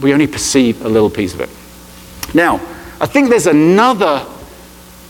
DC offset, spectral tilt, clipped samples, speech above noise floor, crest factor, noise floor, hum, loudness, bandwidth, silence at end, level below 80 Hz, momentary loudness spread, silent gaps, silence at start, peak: under 0.1%; -4.5 dB/octave; under 0.1%; 25 dB; 14 dB; -37 dBFS; none; -13 LUFS; 18.5 kHz; 0.45 s; -42 dBFS; 16 LU; none; 0 s; 0 dBFS